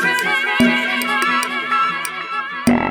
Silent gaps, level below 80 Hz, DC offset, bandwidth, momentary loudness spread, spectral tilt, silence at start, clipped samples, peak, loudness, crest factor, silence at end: none; -50 dBFS; under 0.1%; over 20 kHz; 8 LU; -3.5 dB/octave; 0 s; under 0.1%; -2 dBFS; -17 LUFS; 16 dB; 0 s